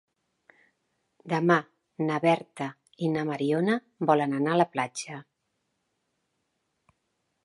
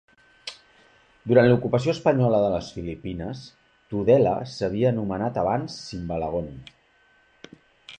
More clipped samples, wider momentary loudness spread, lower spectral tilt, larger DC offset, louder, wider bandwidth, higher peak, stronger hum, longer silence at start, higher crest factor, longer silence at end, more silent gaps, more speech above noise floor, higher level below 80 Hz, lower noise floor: neither; second, 13 LU vs 20 LU; second, -6 dB/octave vs -7.5 dB/octave; neither; second, -27 LUFS vs -23 LUFS; first, 11.5 kHz vs 9.2 kHz; about the same, -6 dBFS vs -4 dBFS; neither; first, 1.25 s vs 0.45 s; about the same, 22 dB vs 20 dB; first, 2.2 s vs 0.05 s; neither; first, 52 dB vs 38 dB; second, -78 dBFS vs -50 dBFS; first, -78 dBFS vs -61 dBFS